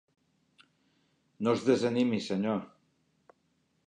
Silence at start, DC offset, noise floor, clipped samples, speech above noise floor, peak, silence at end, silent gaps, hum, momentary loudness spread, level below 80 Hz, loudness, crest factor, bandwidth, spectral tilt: 1.4 s; under 0.1%; -74 dBFS; under 0.1%; 46 dB; -12 dBFS; 1.2 s; none; none; 7 LU; -76 dBFS; -30 LUFS; 22 dB; 10 kHz; -6 dB/octave